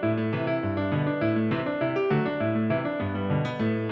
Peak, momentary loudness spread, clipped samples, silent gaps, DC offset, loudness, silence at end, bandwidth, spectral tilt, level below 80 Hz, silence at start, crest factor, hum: -14 dBFS; 2 LU; under 0.1%; none; under 0.1%; -27 LUFS; 0 s; 6.8 kHz; -9 dB/octave; -58 dBFS; 0 s; 12 dB; none